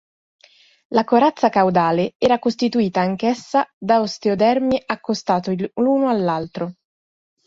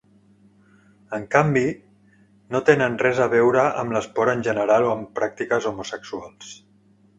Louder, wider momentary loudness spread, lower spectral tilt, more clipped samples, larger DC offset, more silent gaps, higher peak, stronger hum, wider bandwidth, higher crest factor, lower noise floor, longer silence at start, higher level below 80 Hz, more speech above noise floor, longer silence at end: about the same, -19 LUFS vs -21 LUFS; second, 7 LU vs 16 LU; about the same, -6.5 dB/octave vs -6 dB/octave; neither; neither; first, 2.15-2.20 s, 3.73-3.81 s vs none; about the same, -2 dBFS vs 0 dBFS; neither; about the same, 7.8 kHz vs 8.2 kHz; second, 16 dB vs 22 dB; first, under -90 dBFS vs -57 dBFS; second, 0.9 s vs 1.1 s; about the same, -58 dBFS vs -60 dBFS; first, over 72 dB vs 36 dB; about the same, 0.75 s vs 0.65 s